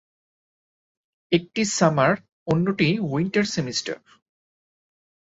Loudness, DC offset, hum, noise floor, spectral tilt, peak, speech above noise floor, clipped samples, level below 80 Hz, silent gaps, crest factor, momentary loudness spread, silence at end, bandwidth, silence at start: -23 LUFS; under 0.1%; none; under -90 dBFS; -5 dB/octave; -4 dBFS; over 68 dB; under 0.1%; -60 dBFS; 2.32-2.46 s; 22 dB; 9 LU; 1.3 s; 8 kHz; 1.3 s